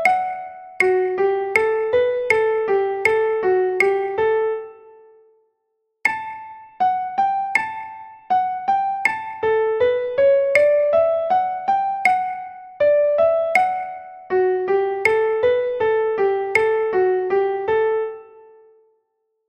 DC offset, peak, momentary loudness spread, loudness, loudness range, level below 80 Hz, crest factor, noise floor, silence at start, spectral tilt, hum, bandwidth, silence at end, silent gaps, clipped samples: under 0.1%; -2 dBFS; 12 LU; -19 LUFS; 5 LU; -60 dBFS; 18 dB; -73 dBFS; 0 s; -4.5 dB/octave; none; 14 kHz; 1.25 s; none; under 0.1%